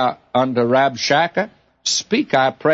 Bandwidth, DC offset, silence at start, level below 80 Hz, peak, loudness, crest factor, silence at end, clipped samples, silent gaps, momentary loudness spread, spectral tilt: 8 kHz; under 0.1%; 0 s; -64 dBFS; -4 dBFS; -18 LUFS; 14 dB; 0 s; under 0.1%; none; 7 LU; -3.5 dB/octave